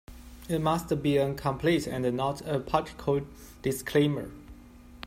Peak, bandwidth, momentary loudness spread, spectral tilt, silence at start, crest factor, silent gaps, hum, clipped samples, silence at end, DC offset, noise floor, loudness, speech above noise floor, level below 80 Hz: -8 dBFS; 16 kHz; 15 LU; -6 dB/octave; 0.1 s; 20 dB; none; none; under 0.1%; 0 s; under 0.1%; -50 dBFS; -29 LUFS; 22 dB; -50 dBFS